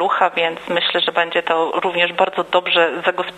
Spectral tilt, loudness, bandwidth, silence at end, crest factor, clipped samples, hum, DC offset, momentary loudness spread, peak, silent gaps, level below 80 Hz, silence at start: -4 dB/octave; -17 LUFS; 10.5 kHz; 0 s; 18 dB; under 0.1%; none; under 0.1%; 4 LU; 0 dBFS; none; -66 dBFS; 0 s